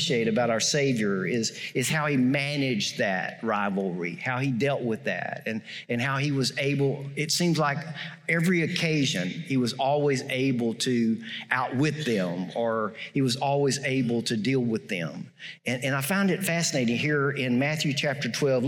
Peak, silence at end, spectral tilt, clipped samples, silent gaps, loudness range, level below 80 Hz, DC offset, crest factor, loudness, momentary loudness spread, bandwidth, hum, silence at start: -8 dBFS; 0 s; -4.5 dB/octave; under 0.1%; none; 2 LU; -72 dBFS; under 0.1%; 18 dB; -26 LUFS; 7 LU; 16.5 kHz; none; 0 s